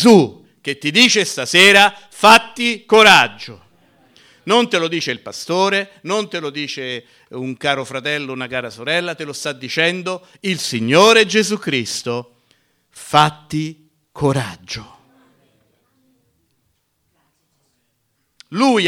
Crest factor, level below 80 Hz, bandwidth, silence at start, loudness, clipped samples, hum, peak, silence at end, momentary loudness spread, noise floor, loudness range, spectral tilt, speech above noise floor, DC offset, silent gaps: 18 dB; -56 dBFS; 17 kHz; 0 s; -15 LUFS; under 0.1%; none; 0 dBFS; 0 s; 18 LU; -67 dBFS; 12 LU; -3.5 dB/octave; 52 dB; under 0.1%; none